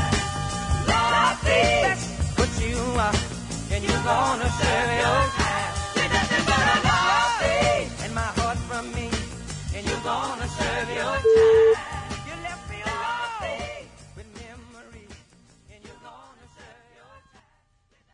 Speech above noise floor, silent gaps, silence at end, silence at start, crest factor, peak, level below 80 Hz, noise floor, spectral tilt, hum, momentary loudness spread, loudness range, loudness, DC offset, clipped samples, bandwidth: 42 dB; none; 0.95 s; 0 s; 18 dB; -6 dBFS; -38 dBFS; -65 dBFS; -4 dB/octave; none; 14 LU; 12 LU; -23 LUFS; under 0.1%; under 0.1%; 11 kHz